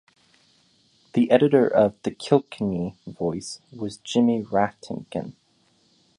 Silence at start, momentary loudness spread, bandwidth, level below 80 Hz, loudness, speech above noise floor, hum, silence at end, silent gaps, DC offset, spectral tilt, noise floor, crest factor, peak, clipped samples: 1.15 s; 15 LU; 10.5 kHz; -60 dBFS; -23 LUFS; 41 dB; none; 0.85 s; none; under 0.1%; -6.5 dB/octave; -64 dBFS; 22 dB; -4 dBFS; under 0.1%